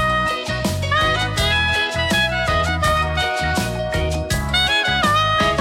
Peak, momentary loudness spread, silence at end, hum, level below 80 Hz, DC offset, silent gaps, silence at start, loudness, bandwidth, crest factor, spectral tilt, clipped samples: -4 dBFS; 6 LU; 0 s; none; -32 dBFS; under 0.1%; none; 0 s; -18 LUFS; 17 kHz; 14 dB; -4 dB/octave; under 0.1%